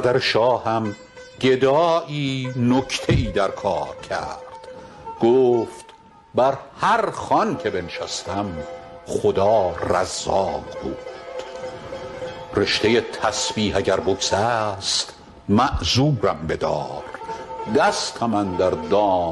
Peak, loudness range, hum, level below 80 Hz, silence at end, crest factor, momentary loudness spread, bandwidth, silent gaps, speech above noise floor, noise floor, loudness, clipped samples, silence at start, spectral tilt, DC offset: -6 dBFS; 3 LU; none; -42 dBFS; 0 s; 16 dB; 15 LU; 12 kHz; none; 27 dB; -47 dBFS; -21 LUFS; under 0.1%; 0 s; -4.5 dB/octave; under 0.1%